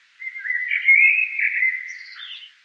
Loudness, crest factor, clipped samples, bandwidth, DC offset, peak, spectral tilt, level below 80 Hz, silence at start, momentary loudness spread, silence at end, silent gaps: -16 LUFS; 16 dB; under 0.1%; 6.8 kHz; under 0.1%; -4 dBFS; 7 dB/octave; under -90 dBFS; 0.2 s; 22 LU; 0.15 s; none